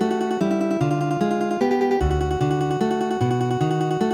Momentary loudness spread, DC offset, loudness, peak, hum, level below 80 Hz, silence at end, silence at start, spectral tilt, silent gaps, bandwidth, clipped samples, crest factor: 2 LU; under 0.1%; -22 LUFS; -8 dBFS; none; -36 dBFS; 0 s; 0 s; -7 dB/octave; none; 14.5 kHz; under 0.1%; 14 dB